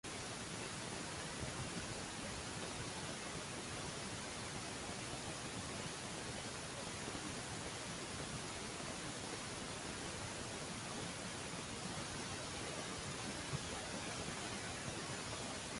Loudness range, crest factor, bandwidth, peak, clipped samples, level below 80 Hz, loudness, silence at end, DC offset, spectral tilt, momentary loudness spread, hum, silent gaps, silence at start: 1 LU; 16 dB; 11.5 kHz; -30 dBFS; under 0.1%; -62 dBFS; -45 LUFS; 0 s; under 0.1%; -3 dB/octave; 1 LU; none; none; 0.05 s